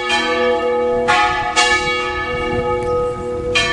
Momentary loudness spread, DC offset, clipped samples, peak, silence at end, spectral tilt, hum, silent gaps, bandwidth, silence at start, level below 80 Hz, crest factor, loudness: 6 LU; under 0.1%; under 0.1%; -2 dBFS; 0 s; -3 dB/octave; none; none; 11.5 kHz; 0 s; -36 dBFS; 16 dB; -16 LUFS